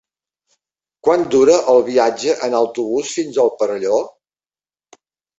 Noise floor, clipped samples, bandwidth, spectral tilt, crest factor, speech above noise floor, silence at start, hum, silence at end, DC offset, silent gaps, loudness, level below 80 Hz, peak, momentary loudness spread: under -90 dBFS; under 0.1%; 8.2 kHz; -4 dB/octave; 16 dB; over 75 dB; 1.05 s; none; 1.3 s; under 0.1%; none; -16 LUFS; -60 dBFS; -2 dBFS; 8 LU